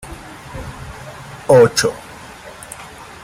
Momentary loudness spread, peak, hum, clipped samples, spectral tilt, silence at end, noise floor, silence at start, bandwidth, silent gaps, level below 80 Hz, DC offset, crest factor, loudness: 24 LU; 0 dBFS; none; under 0.1%; -4 dB/octave; 0.4 s; -36 dBFS; 0.05 s; 16 kHz; none; -42 dBFS; under 0.1%; 18 dB; -13 LUFS